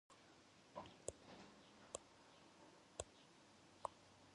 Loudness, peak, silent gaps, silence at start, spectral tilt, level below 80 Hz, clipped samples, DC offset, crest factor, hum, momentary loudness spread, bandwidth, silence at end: -59 LUFS; -26 dBFS; none; 0.1 s; -3 dB/octave; -76 dBFS; under 0.1%; under 0.1%; 34 dB; none; 12 LU; 11 kHz; 0 s